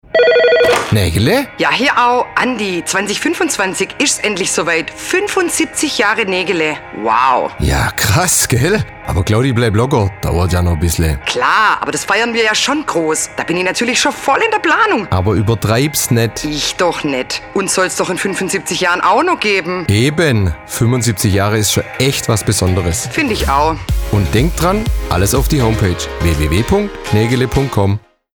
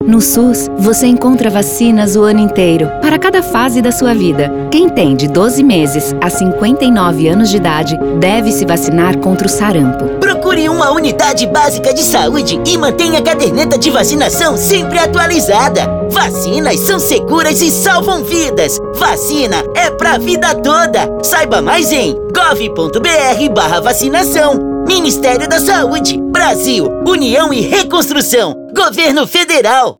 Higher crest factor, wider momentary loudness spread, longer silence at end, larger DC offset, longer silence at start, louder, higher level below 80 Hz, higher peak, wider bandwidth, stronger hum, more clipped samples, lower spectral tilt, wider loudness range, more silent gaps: about the same, 12 dB vs 10 dB; about the same, 5 LU vs 4 LU; first, 0.35 s vs 0.05 s; neither; first, 0.15 s vs 0 s; second, -14 LUFS vs -10 LUFS; first, -28 dBFS vs -34 dBFS; about the same, -2 dBFS vs 0 dBFS; about the same, over 20 kHz vs over 20 kHz; neither; neither; about the same, -4 dB/octave vs -4 dB/octave; about the same, 1 LU vs 1 LU; neither